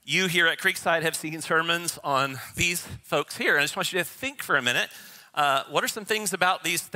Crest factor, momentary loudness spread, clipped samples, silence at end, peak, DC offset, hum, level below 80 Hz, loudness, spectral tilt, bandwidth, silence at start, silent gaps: 22 dB; 8 LU; under 0.1%; 0.05 s; -4 dBFS; under 0.1%; none; -60 dBFS; -25 LUFS; -2.5 dB/octave; 16 kHz; 0.05 s; none